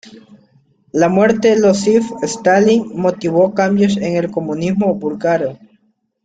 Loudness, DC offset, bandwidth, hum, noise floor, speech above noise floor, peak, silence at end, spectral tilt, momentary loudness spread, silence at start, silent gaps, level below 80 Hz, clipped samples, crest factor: -15 LUFS; under 0.1%; 9.2 kHz; none; -59 dBFS; 45 dB; -2 dBFS; 0.7 s; -6 dB/octave; 7 LU; 0.05 s; none; -54 dBFS; under 0.1%; 14 dB